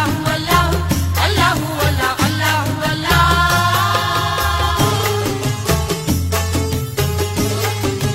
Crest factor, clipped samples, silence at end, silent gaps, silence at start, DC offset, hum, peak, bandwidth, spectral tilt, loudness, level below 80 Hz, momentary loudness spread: 16 dB; under 0.1%; 0 s; none; 0 s; under 0.1%; none; 0 dBFS; 16.5 kHz; -4.5 dB/octave; -16 LUFS; -28 dBFS; 5 LU